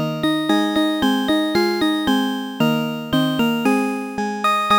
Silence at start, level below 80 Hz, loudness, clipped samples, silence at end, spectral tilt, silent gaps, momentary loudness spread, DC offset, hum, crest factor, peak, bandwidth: 0 s; -52 dBFS; -19 LUFS; under 0.1%; 0 s; -5 dB/octave; none; 4 LU; under 0.1%; none; 16 dB; -4 dBFS; over 20 kHz